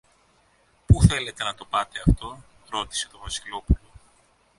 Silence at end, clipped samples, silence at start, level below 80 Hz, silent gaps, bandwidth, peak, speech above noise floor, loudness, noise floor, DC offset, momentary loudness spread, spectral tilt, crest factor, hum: 0.85 s; under 0.1%; 0.9 s; -30 dBFS; none; 11.5 kHz; -2 dBFS; 36 dB; -25 LUFS; -62 dBFS; under 0.1%; 13 LU; -5 dB/octave; 22 dB; none